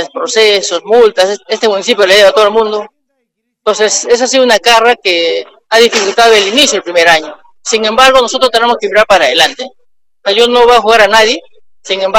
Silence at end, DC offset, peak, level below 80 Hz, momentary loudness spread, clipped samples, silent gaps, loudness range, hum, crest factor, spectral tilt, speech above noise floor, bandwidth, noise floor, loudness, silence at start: 0 s; under 0.1%; 0 dBFS; -44 dBFS; 10 LU; 1%; none; 2 LU; none; 10 dB; -1 dB/octave; 59 dB; 17 kHz; -67 dBFS; -8 LUFS; 0 s